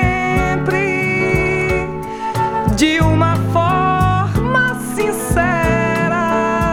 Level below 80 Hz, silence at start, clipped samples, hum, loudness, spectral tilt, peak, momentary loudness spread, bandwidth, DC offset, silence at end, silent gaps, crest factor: -30 dBFS; 0 s; under 0.1%; none; -16 LUFS; -6 dB/octave; -2 dBFS; 5 LU; 19 kHz; under 0.1%; 0 s; none; 14 dB